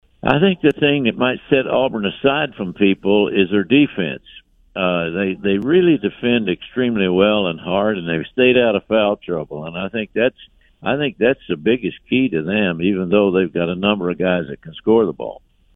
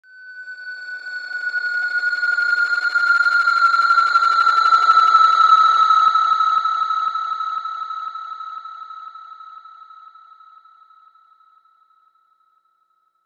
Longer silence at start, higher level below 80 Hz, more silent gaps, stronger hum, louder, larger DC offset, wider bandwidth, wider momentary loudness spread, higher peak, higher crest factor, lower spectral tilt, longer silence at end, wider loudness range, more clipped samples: about the same, 0.25 s vs 0.2 s; first, -50 dBFS vs -84 dBFS; neither; second, none vs 60 Hz at -90 dBFS; second, -18 LUFS vs -15 LUFS; neither; second, 3.9 kHz vs 9.2 kHz; second, 9 LU vs 21 LU; about the same, 0 dBFS vs -2 dBFS; about the same, 18 dB vs 16 dB; first, -9 dB/octave vs 2.5 dB/octave; second, 0.4 s vs 3.25 s; second, 3 LU vs 18 LU; neither